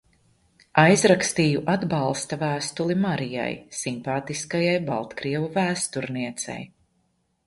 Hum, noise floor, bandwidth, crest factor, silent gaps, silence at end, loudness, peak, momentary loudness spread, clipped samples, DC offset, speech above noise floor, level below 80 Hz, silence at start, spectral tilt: none; -70 dBFS; 11.5 kHz; 22 dB; none; 0.8 s; -24 LUFS; -2 dBFS; 12 LU; under 0.1%; under 0.1%; 46 dB; -60 dBFS; 0.75 s; -4.5 dB/octave